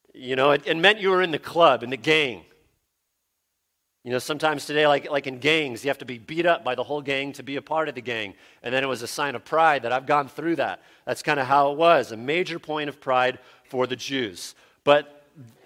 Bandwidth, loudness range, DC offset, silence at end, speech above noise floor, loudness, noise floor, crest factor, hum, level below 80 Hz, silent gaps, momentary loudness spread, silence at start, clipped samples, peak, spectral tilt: 16 kHz; 4 LU; under 0.1%; 0.2 s; 53 dB; -23 LUFS; -77 dBFS; 22 dB; none; -70 dBFS; none; 12 LU; 0.15 s; under 0.1%; -2 dBFS; -4 dB/octave